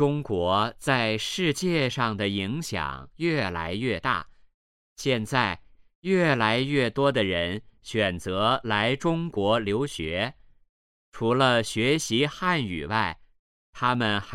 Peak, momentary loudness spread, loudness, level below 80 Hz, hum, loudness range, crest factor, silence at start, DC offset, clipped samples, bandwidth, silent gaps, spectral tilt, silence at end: -6 dBFS; 8 LU; -26 LUFS; -52 dBFS; none; 3 LU; 20 dB; 0 s; under 0.1%; under 0.1%; 16 kHz; 4.54-4.96 s, 5.95-6.02 s, 10.69-11.12 s, 13.39-13.73 s; -5 dB/octave; 0 s